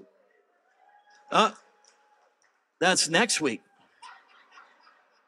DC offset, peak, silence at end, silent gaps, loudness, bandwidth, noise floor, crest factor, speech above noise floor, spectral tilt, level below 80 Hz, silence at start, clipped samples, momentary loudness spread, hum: under 0.1%; -6 dBFS; 1.2 s; none; -24 LUFS; 14 kHz; -70 dBFS; 24 dB; 46 dB; -2 dB/octave; -90 dBFS; 1.3 s; under 0.1%; 7 LU; none